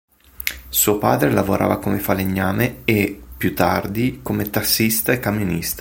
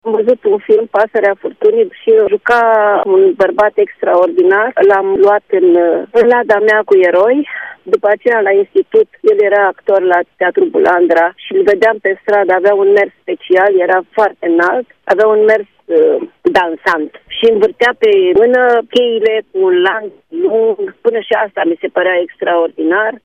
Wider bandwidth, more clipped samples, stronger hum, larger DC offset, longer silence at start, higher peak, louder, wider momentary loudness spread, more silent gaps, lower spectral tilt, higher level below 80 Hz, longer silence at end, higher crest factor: first, 17 kHz vs 7 kHz; neither; neither; neither; first, 0.4 s vs 0.05 s; about the same, 0 dBFS vs 0 dBFS; second, -19 LUFS vs -11 LUFS; about the same, 8 LU vs 6 LU; neither; about the same, -4.5 dB/octave vs -5.5 dB/octave; first, -42 dBFS vs -56 dBFS; about the same, 0 s vs 0.05 s; first, 20 dB vs 10 dB